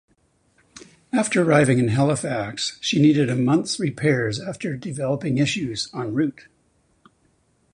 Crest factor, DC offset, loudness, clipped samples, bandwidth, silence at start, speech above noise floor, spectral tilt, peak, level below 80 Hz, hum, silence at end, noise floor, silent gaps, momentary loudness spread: 20 dB; under 0.1%; -21 LUFS; under 0.1%; 11 kHz; 0.75 s; 43 dB; -5.5 dB/octave; -2 dBFS; -56 dBFS; none; 1.45 s; -64 dBFS; none; 10 LU